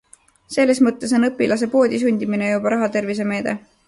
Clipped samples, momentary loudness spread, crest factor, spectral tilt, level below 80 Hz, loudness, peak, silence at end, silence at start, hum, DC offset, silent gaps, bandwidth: under 0.1%; 6 LU; 14 dB; -5.5 dB/octave; -60 dBFS; -19 LUFS; -4 dBFS; 0.3 s; 0.5 s; none; under 0.1%; none; 11.5 kHz